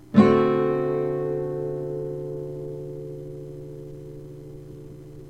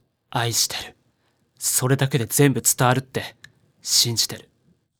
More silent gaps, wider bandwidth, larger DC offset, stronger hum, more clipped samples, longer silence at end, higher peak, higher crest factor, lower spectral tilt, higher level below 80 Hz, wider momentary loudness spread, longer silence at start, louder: neither; second, 8.2 kHz vs over 20 kHz; first, 0.2% vs under 0.1%; neither; neither; second, 0 s vs 0.6 s; about the same, -4 dBFS vs -2 dBFS; about the same, 22 dB vs 20 dB; first, -9 dB/octave vs -3 dB/octave; first, -54 dBFS vs -60 dBFS; first, 22 LU vs 15 LU; second, 0 s vs 0.35 s; second, -25 LUFS vs -20 LUFS